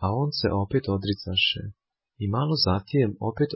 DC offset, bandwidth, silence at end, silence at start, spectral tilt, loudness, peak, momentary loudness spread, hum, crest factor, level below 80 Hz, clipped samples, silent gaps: under 0.1%; 5.8 kHz; 0 s; 0 s; -9 dB/octave; -25 LUFS; -10 dBFS; 7 LU; none; 16 dB; -44 dBFS; under 0.1%; none